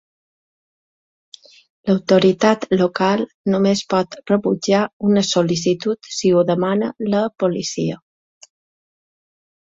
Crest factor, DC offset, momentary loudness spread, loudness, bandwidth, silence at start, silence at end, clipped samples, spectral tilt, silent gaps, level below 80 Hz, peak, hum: 18 dB; under 0.1%; 7 LU; -18 LUFS; 7.8 kHz; 1.85 s; 1.7 s; under 0.1%; -5.5 dB/octave; 3.34-3.44 s, 4.93-5.00 s; -58 dBFS; -2 dBFS; none